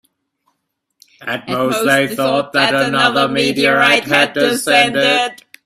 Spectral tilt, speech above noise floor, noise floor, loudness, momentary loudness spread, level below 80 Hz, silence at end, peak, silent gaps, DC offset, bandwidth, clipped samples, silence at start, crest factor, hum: -3.5 dB/octave; 57 dB; -71 dBFS; -13 LUFS; 9 LU; -58 dBFS; 0.3 s; 0 dBFS; none; under 0.1%; 16 kHz; under 0.1%; 1.2 s; 16 dB; none